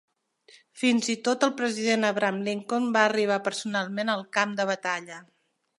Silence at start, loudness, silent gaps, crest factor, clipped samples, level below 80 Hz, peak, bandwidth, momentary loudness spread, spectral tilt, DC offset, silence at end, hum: 0.75 s; -26 LUFS; none; 20 dB; under 0.1%; -80 dBFS; -8 dBFS; 11.5 kHz; 7 LU; -3.5 dB/octave; under 0.1%; 0.55 s; none